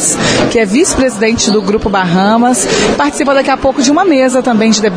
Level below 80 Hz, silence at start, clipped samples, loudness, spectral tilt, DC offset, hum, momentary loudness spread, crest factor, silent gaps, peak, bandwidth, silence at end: -34 dBFS; 0 s; under 0.1%; -10 LUFS; -3.5 dB/octave; under 0.1%; none; 3 LU; 10 dB; none; 0 dBFS; 10.5 kHz; 0 s